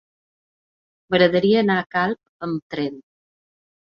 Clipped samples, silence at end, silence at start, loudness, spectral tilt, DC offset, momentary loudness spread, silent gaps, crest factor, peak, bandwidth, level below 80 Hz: under 0.1%; 0.9 s; 1.1 s; -21 LUFS; -8 dB/octave; under 0.1%; 12 LU; 1.86-1.90 s, 2.29-2.40 s, 2.62-2.70 s; 20 dB; -2 dBFS; 6.6 kHz; -62 dBFS